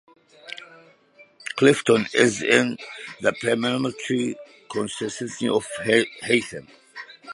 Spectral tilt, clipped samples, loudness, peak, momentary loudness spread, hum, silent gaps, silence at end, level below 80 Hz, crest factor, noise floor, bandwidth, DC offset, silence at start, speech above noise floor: -4 dB/octave; under 0.1%; -22 LUFS; -2 dBFS; 20 LU; none; none; 0 s; -66 dBFS; 22 dB; -54 dBFS; 11.5 kHz; under 0.1%; 0.45 s; 32 dB